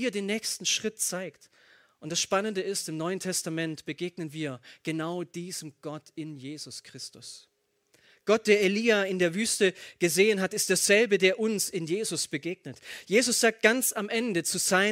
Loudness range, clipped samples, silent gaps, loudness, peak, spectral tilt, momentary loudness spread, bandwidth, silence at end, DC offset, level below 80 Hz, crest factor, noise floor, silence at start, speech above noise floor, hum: 12 LU; under 0.1%; none; -27 LUFS; -6 dBFS; -3 dB/octave; 18 LU; 16.5 kHz; 0 s; under 0.1%; -76 dBFS; 22 dB; -68 dBFS; 0 s; 40 dB; none